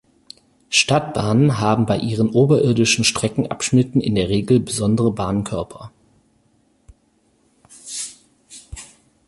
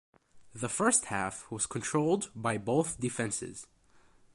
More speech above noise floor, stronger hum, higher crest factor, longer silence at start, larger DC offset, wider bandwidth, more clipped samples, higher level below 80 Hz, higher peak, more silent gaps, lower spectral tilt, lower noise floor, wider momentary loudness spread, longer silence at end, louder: first, 44 dB vs 30 dB; neither; about the same, 18 dB vs 20 dB; first, 0.7 s vs 0.35 s; neither; about the same, 11.5 kHz vs 11.5 kHz; neither; first, -46 dBFS vs -64 dBFS; first, -2 dBFS vs -14 dBFS; neither; about the same, -5 dB/octave vs -4 dB/octave; about the same, -61 dBFS vs -62 dBFS; first, 17 LU vs 12 LU; second, 0.45 s vs 0.7 s; first, -18 LUFS vs -31 LUFS